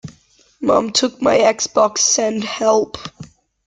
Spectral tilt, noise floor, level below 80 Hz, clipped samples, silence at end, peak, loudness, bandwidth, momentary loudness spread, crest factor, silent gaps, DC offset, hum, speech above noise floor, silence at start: -2 dB/octave; -53 dBFS; -56 dBFS; under 0.1%; 0.4 s; -2 dBFS; -16 LUFS; 10.5 kHz; 11 LU; 16 dB; none; under 0.1%; none; 37 dB; 0.05 s